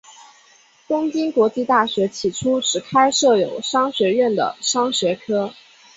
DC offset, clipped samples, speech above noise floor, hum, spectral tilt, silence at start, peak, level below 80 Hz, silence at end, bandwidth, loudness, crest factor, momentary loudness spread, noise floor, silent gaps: under 0.1%; under 0.1%; 34 dB; none; -3 dB/octave; 0.1 s; -2 dBFS; -60 dBFS; 0.45 s; 8 kHz; -19 LUFS; 18 dB; 6 LU; -53 dBFS; none